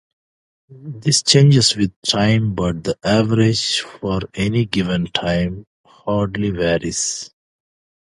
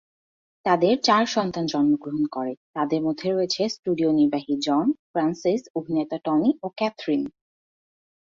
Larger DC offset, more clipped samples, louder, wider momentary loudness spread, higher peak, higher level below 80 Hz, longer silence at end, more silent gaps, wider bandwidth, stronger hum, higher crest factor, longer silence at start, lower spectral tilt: neither; neither; first, -17 LUFS vs -24 LUFS; first, 12 LU vs 8 LU; first, 0 dBFS vs -6 dBFS; first, -42 dBFS vs -66 dBFS; second, 0.8 s vs 1.1 s; second, 1.96-2.02 s, 5.67-5.84 s vs 2.57-2.74 s, 3.79-3.83 s, 4.99-5.14 s, 5.70-5.74 s; first, 11.5 kHz vs 7.6 kHz; neither; about the same, 18 dB vs 18 dB; about the same, 0.7 s vs 0.65 s; about the same, -4.5 dB/octave vs -5.5 dB/octave